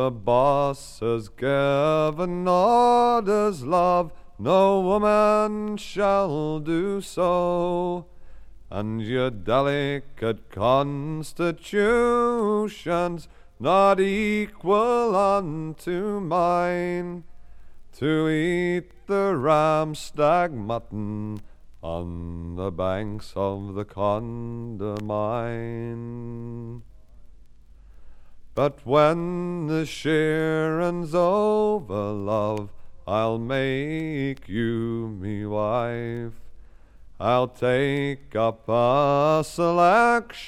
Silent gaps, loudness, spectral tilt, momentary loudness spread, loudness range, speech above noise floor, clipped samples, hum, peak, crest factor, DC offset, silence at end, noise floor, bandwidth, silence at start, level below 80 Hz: none; -24 LUFS; -6.5 dB/octave; 13 LU; 8 LU; 24 dB; under 0.1%; none; -6 dBFS; 18 dB; under 0.1%; 0 s; -47 dBFS; 14 kHz; 0 s; -48 dBFS